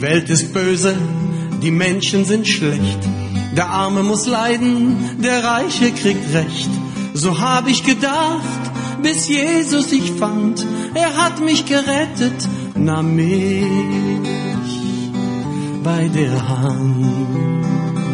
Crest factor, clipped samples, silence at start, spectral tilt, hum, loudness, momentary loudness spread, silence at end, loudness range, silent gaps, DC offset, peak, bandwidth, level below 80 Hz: 16 dB; under 0.1%; 0 s; -5 dB/octave; none; -17 LUFS; 6 LU; 0 s; 2 LU; none; under 0.1%; -2 dBFS; 10.5 kHz; -46 dBFS